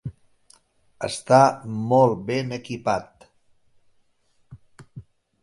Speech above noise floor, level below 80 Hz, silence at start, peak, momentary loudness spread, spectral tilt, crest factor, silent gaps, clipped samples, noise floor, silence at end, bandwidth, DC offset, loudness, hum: 43 dB; -58 dBFS; 0.05 s; -2 dBFS; 14 LU; -6 dB/octave; 24 dB; none; under 0.1%; -64 dBFS; 0.4 s; 11.5 kHz; under 0.1%; -22 LUFS; none